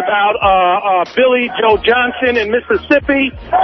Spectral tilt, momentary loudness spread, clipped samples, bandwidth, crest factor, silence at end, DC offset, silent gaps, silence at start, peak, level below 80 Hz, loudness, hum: -6 dB/octave; 4 LU; under 0.1%; 6.2 kHz; 12 dB; 0 s; under 0.1%; none; 0 s; 0 dBFS; -38 dBFS; -13 LUFS; none